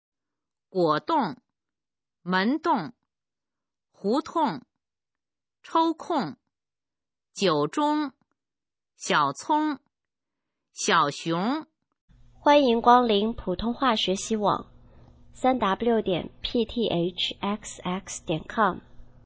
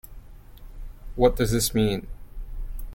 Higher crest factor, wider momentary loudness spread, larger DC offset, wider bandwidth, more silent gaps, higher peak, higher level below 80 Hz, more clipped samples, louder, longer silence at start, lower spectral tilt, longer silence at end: about the same, 22 dB vs 22 dB; second, 12 LU vs 24 LU; neither; second, 8 kHz vs 17 kHz; first, 12.01-12.08 s vs none; about the same, -4 dBFS vs -4 dBFS; second, -54 dBFS vs -34 dBFS; neither; about the same, -25 LUFS vs -23 LUFS; first, 0.75 s vs 0.05 s; about the same, -4.5 dB/octave vs -5 dB/octave; first, 0.2 s vs 0 s